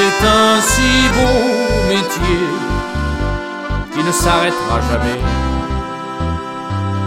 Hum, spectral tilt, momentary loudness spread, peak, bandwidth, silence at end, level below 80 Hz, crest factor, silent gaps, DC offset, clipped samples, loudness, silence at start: none; -4 dB/octave; 11 LU; 0 dBFS; 16.5 kHz; 0 s; -24 dBFS; 14 dB; none; under 0.1%; under 0.1%; -15 LUFS; 0 s